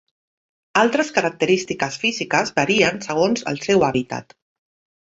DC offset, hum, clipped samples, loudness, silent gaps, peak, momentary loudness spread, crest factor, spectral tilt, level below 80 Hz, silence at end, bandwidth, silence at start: under 0.1%; none; under 0.1%; -19 LUFS; none; -2 dBFS; 7 LU; 20 dB; -4 dB/octave; -56 dBFS; 0.8 s; 8 kHz; 0.75 s